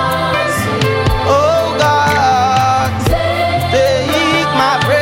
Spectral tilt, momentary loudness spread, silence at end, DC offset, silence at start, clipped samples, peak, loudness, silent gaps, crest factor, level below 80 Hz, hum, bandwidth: -5 dB/octave; 3 LU; 0 s; under 0.1%; 0 s; under 0.1%; 0 dBFS; -13 LUFS; none; 12 dB; -30 dBFS; none; 16.5 kHz